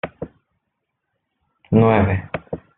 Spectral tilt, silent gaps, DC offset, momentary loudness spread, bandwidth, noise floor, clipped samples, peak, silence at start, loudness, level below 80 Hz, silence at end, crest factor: -7.5 dB/octave; none; under 0.1%; 21 LU; 4 kHz; -77 dBFS; under 0.1%; -2 dBFS; 0.05 s; -17 LUFS; -48 dBFS; 0.2 s; 20 dB